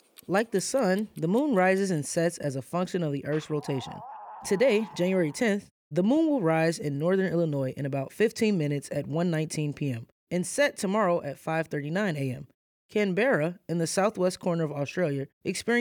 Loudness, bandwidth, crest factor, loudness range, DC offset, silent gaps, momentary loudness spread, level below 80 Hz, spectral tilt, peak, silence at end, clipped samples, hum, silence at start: -28 LUFS; 19 kHz; 16 dB; 2 LU; under 0.1%; 5.71-5.91 s, 10.12-10.27 s, 12.54-12.89 s, 15.33-15.41 s; 9 LU; -70 dBFS; -5.5 dB/octave; -12 dBFS; 0 s; under 0.1%; none; 0.3 s